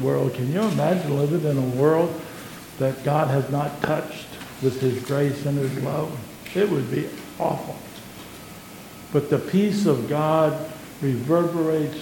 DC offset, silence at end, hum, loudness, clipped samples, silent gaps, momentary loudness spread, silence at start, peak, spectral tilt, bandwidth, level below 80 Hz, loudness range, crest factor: under 0.1%; 0 s; none; -23 LUFS; under 0.1%; none; 17 LU; 0 s; -6 dBFS; -7 dB/octave; 17.5 kHz; -58 dBFS; 4 LU; 18 dB